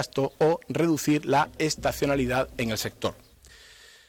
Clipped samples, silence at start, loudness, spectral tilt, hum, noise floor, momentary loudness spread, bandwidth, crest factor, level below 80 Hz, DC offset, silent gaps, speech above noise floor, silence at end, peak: under 0.1%; 0 s; -26 LUFS; -5 dB/octave; none; -52 dBFS; 6 LU; 18 kHz; 12 dB; -50 dBFS; under 0.1%; none; 26 dB; 0.95 s; -14 dBFS